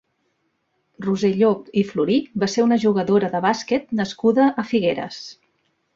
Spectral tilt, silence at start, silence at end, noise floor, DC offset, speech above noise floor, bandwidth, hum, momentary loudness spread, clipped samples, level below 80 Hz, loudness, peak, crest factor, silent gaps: -6 dB/octave; 1 s; 0.6 s; -70 dBFS; under 0.1%; 51 dB; 7.8 kHz; none; 9 LU; under 0.1%; -62 dBFS; -20 LUFS; -4 dBFS; 16 dB; none